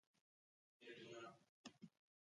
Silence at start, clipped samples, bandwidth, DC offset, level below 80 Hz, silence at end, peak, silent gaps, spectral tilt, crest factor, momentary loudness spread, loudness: 0.8 s; under 0.1%; 11 kHz; under 0.1%; under -90 dBFS; 0.35 s; -42 dBFS; 1.49-1.64 s; -4 dB/octave; 22 dB; 10 LU; -61 LUFS